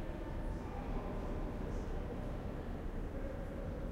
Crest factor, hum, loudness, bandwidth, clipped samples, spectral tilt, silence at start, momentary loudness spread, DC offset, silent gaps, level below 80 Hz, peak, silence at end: 14 dB; none; -44 LUFS; 10 kHz; under 0.1%; -8 dB/octave; 0 s; 2 LU; under 0.1%; none; -44 dBFS; -28 dBFS; 0 s